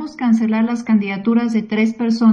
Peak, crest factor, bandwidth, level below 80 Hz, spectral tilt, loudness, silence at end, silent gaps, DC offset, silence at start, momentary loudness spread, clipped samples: -4 dBFS; 12 dB; 7.2 kHz; -62 dBFS; -7 dB/octave; -17 LUFS; 0 s; none; under 0.1%; 0 s; 3 LU; under 0.1%